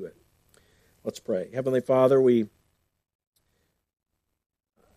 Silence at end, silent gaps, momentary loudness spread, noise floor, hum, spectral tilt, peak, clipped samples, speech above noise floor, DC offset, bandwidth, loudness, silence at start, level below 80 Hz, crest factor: 2.5 s; none; 18 LU; -74 dBFS; none; -7.5 dB/octave; -8 dBFS; under 0.1%; 51 dB; under 0.1%; 14 kHz; -23 LUFS; 0 s; -72 dBFS; 20 dB